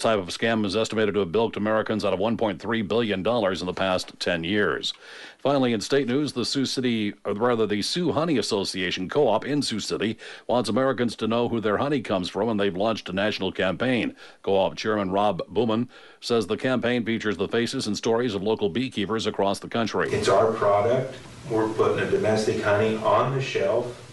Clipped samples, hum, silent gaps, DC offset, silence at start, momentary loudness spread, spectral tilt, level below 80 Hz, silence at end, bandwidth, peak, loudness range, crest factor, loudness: under 0.1%; none; none; under 0.1%; 0 s; 5 LU; -5 dB/octave; -58 dBFS; 0 s; 11.5 kHz; -10 dBFS; 2 LU; 14 dB; -24 LUFS